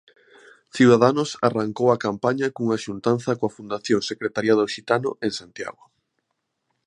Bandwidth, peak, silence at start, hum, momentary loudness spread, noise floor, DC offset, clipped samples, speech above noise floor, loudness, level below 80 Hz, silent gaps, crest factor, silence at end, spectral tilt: 10.5 kHz; -2 dBFS; 0.75 s; none; 13 LU; -77 dBFS; under 0.1%; under 0.1%; 55 dB; -22 LUFS; -64 dBFS; none; 22 dB; 1.15 s; -5.5 dB/octave